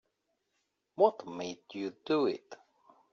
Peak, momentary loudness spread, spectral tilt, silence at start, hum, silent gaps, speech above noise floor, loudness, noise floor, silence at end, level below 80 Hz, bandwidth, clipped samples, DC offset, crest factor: -12 dBFS; 13 LU; -4 dB/octave; 1 s; none; none; 49 dB; -33 LUFS; -81 dBFS; 0.6 s; -82 dBFS; 7.2 kHz; under 0.1%; under 0.1%; 24 dB